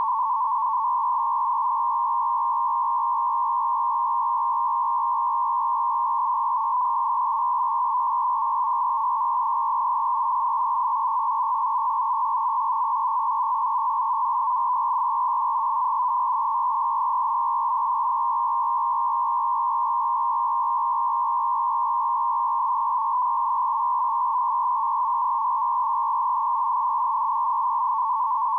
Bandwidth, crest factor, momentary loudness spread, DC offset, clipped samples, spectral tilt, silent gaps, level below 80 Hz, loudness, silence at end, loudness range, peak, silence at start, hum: 1.9 kHz; 4 dB; 0 LU; under 0.1%; under 0.1%; 0 dB/octave; none; -86 dBFS; -23 LUFS; 0 s; 0 LU; -18 dBFS; 0 s; none